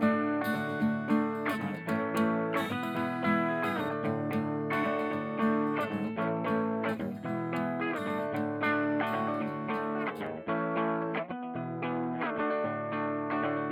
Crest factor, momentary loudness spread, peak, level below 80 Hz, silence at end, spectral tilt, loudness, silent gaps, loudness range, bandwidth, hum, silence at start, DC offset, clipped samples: 16 dB; 5 LU; -16 dBFS; -78 dBFS; 0 s; -7 dB/octave; -32 LUFS; none; 2 LU; 17 kHz; none; 0 s; under 0.1%; under 0.1%